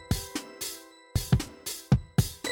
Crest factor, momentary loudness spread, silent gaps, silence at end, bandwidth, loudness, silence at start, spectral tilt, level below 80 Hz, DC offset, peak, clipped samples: 18 dB; 11 LU; none; 0 s; 18.5 kHz; -30 LUFS; 0 s; -5 dB/octave; -40 dBFS; under 0.1%; -12 dBFS; under 0.1%